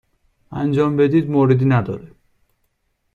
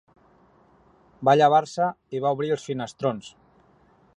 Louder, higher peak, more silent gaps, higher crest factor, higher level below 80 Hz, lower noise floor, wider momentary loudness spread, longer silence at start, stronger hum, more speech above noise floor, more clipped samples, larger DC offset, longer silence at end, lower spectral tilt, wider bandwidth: first, -17 LUFS vs -23 LUFS; about the same, -2 dBFS vs -4 dBFS; neither; about the same, 16 dB vs 20 dB; first, -54 dBFS vs -68 dBFS; first, -68 dBFS vs -59 dBFS; first, 15 LU vs 11 LU; second, 0.5 s vs 1.2 s; neither; first, 52 dB vs 36 dB; neither; neither; first, 1.1 s vs 0.9 s; first, -10 dB/octave vs -6 dB/octave; second, 6.8 kHz vs 10.5 kHz